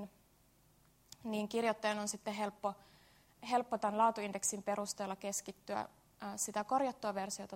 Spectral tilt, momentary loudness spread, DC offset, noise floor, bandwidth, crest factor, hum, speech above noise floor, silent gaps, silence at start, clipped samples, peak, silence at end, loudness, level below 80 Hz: -3 dB/octave; 13 LU; under 0.1%; -69 dBFS; 16 kHz; 20 dB; none; 31 dB; none; 0 s; under 0.1%; -20 dBFS; 0 s; -38 LUFS; -76 dBFS